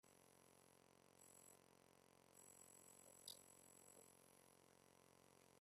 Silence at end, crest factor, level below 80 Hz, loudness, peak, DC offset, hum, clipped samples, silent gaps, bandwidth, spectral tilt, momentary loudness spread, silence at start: 0 s; 30 dB; under -90 dBFS; -65 LUFS; -40 dBFS; under 0.1%; none; under 0.1%; none; 14.5 kHz; -2 dB/octave; 8 LU; 0.05 s